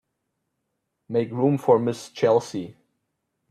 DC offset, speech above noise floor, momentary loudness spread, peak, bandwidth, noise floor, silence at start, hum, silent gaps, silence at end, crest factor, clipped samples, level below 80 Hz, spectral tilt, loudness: under 0.1%; 56 dB; 14 LU; -6 dBFS; 13.5 kHz; -78 dBFS; 1.1 s; none; none; 0.8 s; 20 dB; under 0.1%; -68 dBFS; -7 dB/octave; -23 LUFS